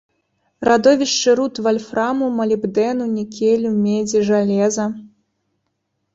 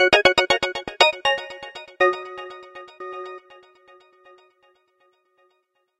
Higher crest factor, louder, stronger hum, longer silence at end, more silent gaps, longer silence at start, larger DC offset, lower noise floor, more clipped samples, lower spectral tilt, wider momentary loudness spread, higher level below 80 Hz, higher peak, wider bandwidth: second, 16 dB vs 24 dB; about the same, -17 LUFS vs -19 LUFS; neither; second, 1.05 s vs 2.6 s; neither; first, 0.6 s vs 0 s; neither; about the same, -72 dBFS vs -70 dBFS; neither; first, -4.5 dB/octave vs -2 dB/octave; second, 8 LU vs 22 LU; about the same, -58 dBFS vs -56 dBFS; about the same, -2 dBFS vs 0 dBFS; second, 8 kHz vs 14 kHz